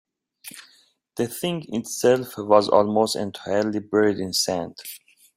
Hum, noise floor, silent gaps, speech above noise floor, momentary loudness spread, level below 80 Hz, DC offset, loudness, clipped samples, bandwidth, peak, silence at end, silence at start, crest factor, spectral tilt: none; -59 dBFS; none; 37 dB; 20 LU; -64 dBFS; under 0.1%; -22 LUFS; under 0.1%; 16 kHz; -2 dBFS; 0.4 s; 0.45 s; 22 dB; -4 dB/octave